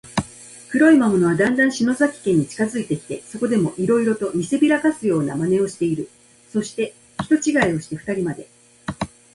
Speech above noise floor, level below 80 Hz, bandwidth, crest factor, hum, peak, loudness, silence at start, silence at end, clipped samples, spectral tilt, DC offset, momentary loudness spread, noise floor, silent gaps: 23 dB; -54 dBFS; 11.5 kHz; 16 dB; none; -4 dBFS; -20 LUFS; 0.05 s; 0.25 s; under 0.1%; -6 dB/octave; under 0.1%; 13 LU; -42 dBFS; none